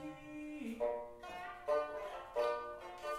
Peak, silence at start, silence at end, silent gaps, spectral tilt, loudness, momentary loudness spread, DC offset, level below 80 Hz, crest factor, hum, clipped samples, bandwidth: -26 dBFS; 0 s; 0 s; none; -4.5 dB/octave; -42 LUFS; 10 LU; under 0.1%; -68 dBFS; 16 dB; none; under 0.1%; 15 kHz